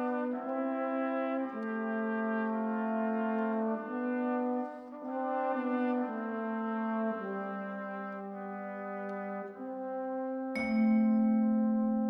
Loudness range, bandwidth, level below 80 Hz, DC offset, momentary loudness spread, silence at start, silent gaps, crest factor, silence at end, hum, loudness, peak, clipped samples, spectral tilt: 6 LU; 5.4 kHz; -72 dBFS; under 0.1%; 12 LU; 0 s; none; 14 dB; 0 s; none; -34 LUFS; -20 dBFS; under 0.1%; -9 dB/octave